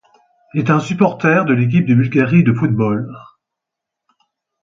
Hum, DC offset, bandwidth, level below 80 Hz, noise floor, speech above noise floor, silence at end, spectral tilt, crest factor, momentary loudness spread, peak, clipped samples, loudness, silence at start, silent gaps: none; under 0.1%; 7.6 kHz; -54 dBFS; -82 dBFS; 68 dB; 1.4 s; -8.5 dB/octave; 16 dB; 8 LU; 0 dBFS; under 0.1%; -15 LUFS; 0.55 s; none